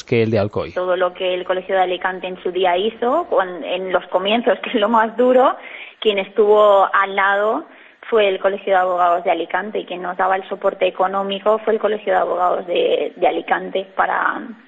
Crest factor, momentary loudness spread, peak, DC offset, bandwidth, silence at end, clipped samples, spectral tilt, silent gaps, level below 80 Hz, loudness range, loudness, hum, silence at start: 16 dB; 8 LU; -2 dBFS; under 0.1%; 7.8 kHz; 0.15 s; under 0.1%; -7 dB/octave; none; -60 dBFS; 4 LU; -18 LUFS; none; 0.1 s